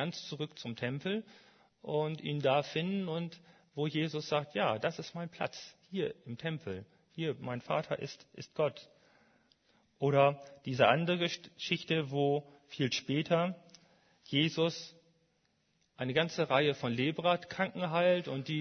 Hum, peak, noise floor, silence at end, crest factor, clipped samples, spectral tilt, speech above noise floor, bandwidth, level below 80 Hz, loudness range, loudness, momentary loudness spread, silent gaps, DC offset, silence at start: none; -10 dBFS; -75 dBFS; 0 s; 24 dB; under 0.1%; -5.5 dB/octave; 42 dB; 6.6 kHz; -76 dBFS; 7 LU; -34 LUFS; 14 LU; none; under 0.1%; 0 s